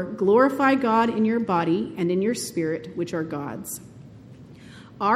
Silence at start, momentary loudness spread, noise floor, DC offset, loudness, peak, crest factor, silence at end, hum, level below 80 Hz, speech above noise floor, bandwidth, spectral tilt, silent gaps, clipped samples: 0 s; 13 LU; -45 dBFS; under 0.1%; -23 LUFS; -8 dBFS; 16 dB; 0 s; none; -62 dBFS; 22 dB; 15.5 kHz; -5.5 dB/octave; none; under 0.1%